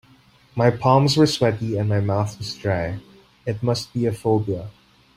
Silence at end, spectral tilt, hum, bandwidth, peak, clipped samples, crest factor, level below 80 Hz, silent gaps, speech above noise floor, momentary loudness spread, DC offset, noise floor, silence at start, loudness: 0.45 s; -6 dB/octave; none; 15.5 kHz; -2 dBFS; under 0.1%; 20 dB; -52 dBFS; none; 33 dB; 14 LU; under 0.1%; -54 dBFS; 0.55 s; -21 LUFS